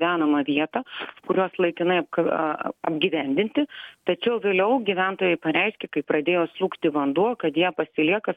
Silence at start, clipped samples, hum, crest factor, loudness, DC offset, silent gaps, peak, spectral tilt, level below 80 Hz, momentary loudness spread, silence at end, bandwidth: 0 s; under 0.1%; none; 16 dB; -24 LUFS; under 0.1%; none; -8 dBFS; -8 dB/octave; -68 dBFS; 6 LU; 0 s; 4.7 kHz